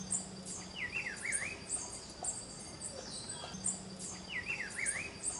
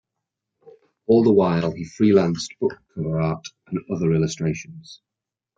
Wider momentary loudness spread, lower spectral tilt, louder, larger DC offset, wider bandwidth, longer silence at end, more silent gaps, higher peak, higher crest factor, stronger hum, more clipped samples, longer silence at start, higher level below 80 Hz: second, 8 LU vs 15 LU; second, -1.5 dB/octave vs -7 dB/octave; second, -39 LUFS vs -21 LUFS; neither; first, 11.5 kHz vs 7.8 kHz; second, 0 s vs 0.65 s; neither; second, -22 dBFS vs -4 dBFS; about the same, 20 dB vs 18 dB; neither; neither; second, 0 s vs 0.65 s; second, -64 dBFS vs -56 dBFS